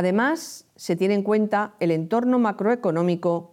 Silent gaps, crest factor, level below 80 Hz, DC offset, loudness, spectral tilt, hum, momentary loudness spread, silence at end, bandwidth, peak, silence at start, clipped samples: none; 12 dB; -76 dBFS; under 0.1%; -23 LUFS; -6.5 dB/octave; none; 7 LU; 0.05 s; 16 kHz; -10 dBFS; 0 s; under 0.1%